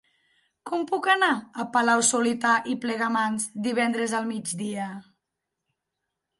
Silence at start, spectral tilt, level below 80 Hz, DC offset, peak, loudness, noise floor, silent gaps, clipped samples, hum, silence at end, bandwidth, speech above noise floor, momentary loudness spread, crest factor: 0.65 s; -2.5 dB/octave; -74 dBFS; under 0.1%; -8 dBFS; -25 LUFS; -83 dBFS; none; under 0.1%; none; 1.4 s; 12 kHz; 59 dB; 11 LU; 20 dB